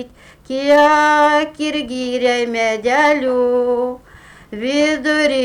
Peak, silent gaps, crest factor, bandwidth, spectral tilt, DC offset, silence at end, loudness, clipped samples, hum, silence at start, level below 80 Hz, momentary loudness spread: -4 dBFS; none; 12 dB; 12.5 kHz; -3 dB/octave; under 0.1%; 0 s; -15 LUFS; under 0.1%; none; 0 s; -52 dBFS; 13 LU